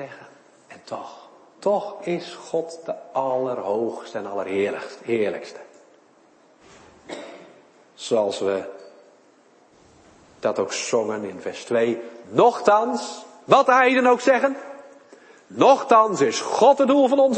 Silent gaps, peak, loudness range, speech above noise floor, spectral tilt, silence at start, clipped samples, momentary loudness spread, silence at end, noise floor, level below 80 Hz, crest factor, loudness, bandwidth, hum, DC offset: none; -2 dBFS; 11 LU; 35 dB; -4 dB/octave; 0 s; under 0.1%; 20 LU; 0 s; -56 dBFS; -74 dBFS; 20 dB; -21 LUFS; 8.8 kHz; none; under 0.1%